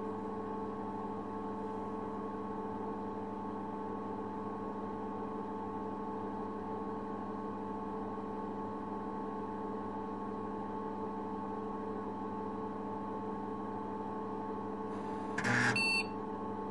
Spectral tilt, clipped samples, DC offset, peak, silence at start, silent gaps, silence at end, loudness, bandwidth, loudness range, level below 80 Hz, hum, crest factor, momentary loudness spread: -5.5 dB/octave; under 0.1%; 0.2%; -18 dBFS; 0 s; none; 0 s; -39 LUFS; 11 kHz; 5 LU; -66 dBFS; none; 22 dB; 4 LU